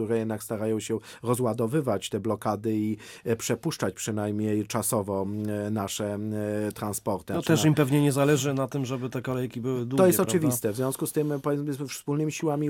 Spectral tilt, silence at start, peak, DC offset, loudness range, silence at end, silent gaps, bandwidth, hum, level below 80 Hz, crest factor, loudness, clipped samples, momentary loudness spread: -5.5 dB/octave; 0 s; -8 dBFS; under 0.1%; 4 LU; 0 s; none; 19 kHz; none; -64 dBFS; 18 dB; -27 LUFS; under 0.1%; 9 LU